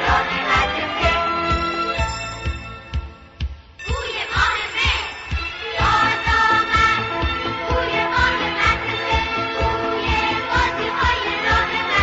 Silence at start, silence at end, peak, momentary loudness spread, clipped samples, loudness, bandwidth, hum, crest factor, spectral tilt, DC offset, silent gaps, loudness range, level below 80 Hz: 0 s; 0 s; -6 dBFS; 12 LU; under 0.1%; -19 LUFS; 8 kHz; none; 14 dB; -2 dB/octave; under 0.1%; none; 5 LU; -32 dBFS